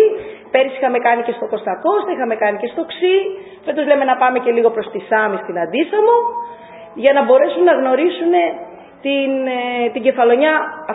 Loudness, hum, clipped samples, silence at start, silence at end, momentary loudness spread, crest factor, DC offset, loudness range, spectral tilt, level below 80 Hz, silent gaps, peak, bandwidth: -16 LUFS; none; under 0.1%; 0 s; 0 s; 11 LU; 16 dB; under 0.1%; 3 LU; -8.5 dB/octave; -66 dBFS; none; 0 dBFS; 4 kHz